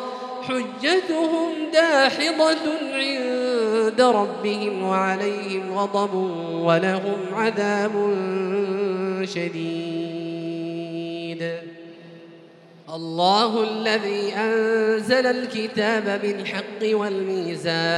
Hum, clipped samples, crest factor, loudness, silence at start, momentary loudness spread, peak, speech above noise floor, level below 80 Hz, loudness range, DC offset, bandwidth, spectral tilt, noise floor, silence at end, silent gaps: none; under 0.1%; 18 dB; -22 LUFS; 0 s; 11 LU; -4 dBFS; 26 dB; -78 dBFS; 8 LU; under 0.1%; 12 kHz; -5 dB/octave; -48 dBFS; 0 s; none